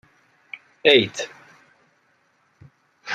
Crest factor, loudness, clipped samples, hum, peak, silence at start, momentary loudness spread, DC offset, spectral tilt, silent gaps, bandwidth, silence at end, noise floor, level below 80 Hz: 24 dB; -18 LUFS; under 0.1%; none; -2 dBFS; 0.85 s; 24 LU; under 0.1%; -3.5 dB/octave; none; 12 kHz; 0 s; -64 dBFS; -68 dBFS